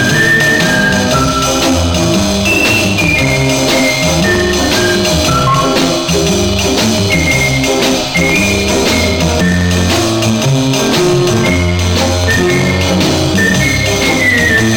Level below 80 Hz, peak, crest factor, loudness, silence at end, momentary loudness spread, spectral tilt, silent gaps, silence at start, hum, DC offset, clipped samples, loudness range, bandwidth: -26 dBFS; 0 dBFS; 10 dB; -10 LUFS; 0 s; 3 LU; -4 dB/octave; none; 0 s; none; under 0.1%; under 0.1%; 1 LU; 18 kHz